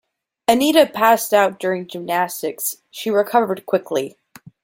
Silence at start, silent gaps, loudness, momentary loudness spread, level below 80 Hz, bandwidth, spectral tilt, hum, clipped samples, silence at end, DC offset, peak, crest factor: 0.5 s; none; -18 LUFS; 11 LU; -64 dBFS; 17 kHz; -3.5 dB/octave; none; under 0.1%; 0.55 s; under 0.1%; 0 dBFS; 18 dB